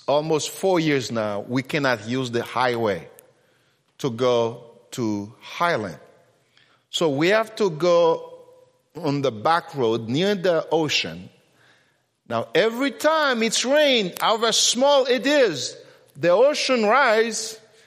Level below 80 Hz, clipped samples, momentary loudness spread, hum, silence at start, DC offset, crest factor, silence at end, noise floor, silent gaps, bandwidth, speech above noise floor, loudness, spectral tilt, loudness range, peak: -70 dBFS; under 0.1%; 12 LU; none; 0.1 s; under 0.1%; 18 dB; 0.3 s; -64 dBFS; none; 15.5 kHz; 43 dB; -21 LUFS; -3.5 dB/octave; 7 LU; -4 dBFS